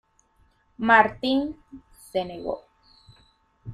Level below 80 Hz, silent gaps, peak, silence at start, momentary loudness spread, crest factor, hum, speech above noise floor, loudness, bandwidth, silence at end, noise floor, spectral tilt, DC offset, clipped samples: -58 dBFS; none; -4 dBFS; 0.8 s; 20 LU; 24 dB; none; 40 dB; -23 LUFS; 14 kHz; 0 s; -63 dBFS; -5.5 dB/octave; under 0.1%; under 0.1%